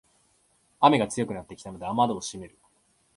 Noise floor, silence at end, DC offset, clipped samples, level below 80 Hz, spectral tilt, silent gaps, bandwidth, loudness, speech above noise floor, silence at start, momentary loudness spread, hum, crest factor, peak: -67 dBFS; 0.7 s; under 0.1%; under 0.1%; -60 dBFS; -5 dB/octave; none; 11.5 kHz; -26 LUFS; 41 dB; 0.8 s; 21 LU; none; 24 dB; -4 dBFS